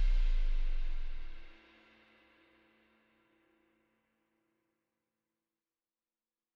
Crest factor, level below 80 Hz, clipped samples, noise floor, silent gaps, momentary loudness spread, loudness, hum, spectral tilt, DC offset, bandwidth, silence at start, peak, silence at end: 14 dB; -36 dBFS; under 0.1%; under -90 dBFS; none; 26 LU; -40 LUFS; none; -6 dB/octave; under 0.1%; 5 kHz; 0 s; -22 dBFS; 5.05 s